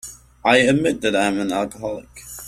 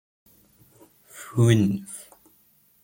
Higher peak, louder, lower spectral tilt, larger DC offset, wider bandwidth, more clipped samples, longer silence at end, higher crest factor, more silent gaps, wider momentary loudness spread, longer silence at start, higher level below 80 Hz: first, -2 dBFS vs -6 dBFS; first, -19 LUFS vs -22 LUFS; second, -4.5 dB/octave vs -6.5 dB/octave; neither; second, 15 kHz vs 17 kHz; neither; second, 0 s vs 0.8 s; about the same, 18 dB vs 20 dB; neither; second, 18 LU vs 23 LU; second, 0.05 s vs 1.15 s; first, -50 dBFS vs -60 dBFS